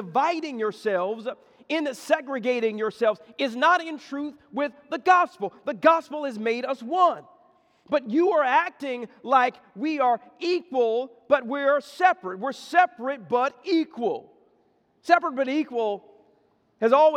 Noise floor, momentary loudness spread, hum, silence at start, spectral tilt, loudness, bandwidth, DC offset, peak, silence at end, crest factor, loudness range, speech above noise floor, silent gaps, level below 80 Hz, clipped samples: -65 dBFS; 12 LU; none; 0 s; -4.5 dB/octave; -25 LUFS; 13.5 kHz; under 0.1%; -4 dBFS; 0 s; 20 dB; 3 LU; 41 dB; none; -82 dBFS; under 0.1%